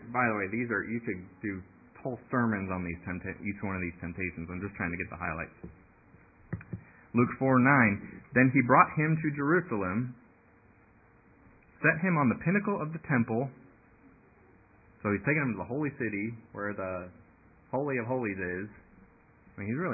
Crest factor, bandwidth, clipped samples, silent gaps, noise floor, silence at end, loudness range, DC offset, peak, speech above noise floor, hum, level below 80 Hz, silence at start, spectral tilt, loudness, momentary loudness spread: 26 dB; 2.7 kHz; under 0.1%; none; -61 dBFS; 0 s; 10 LU; under 0.1%; -6 dBFS; 31 dB; none; -56 dBFS; 0 s; -14 dB/octave; -30 LUFS; 16 LU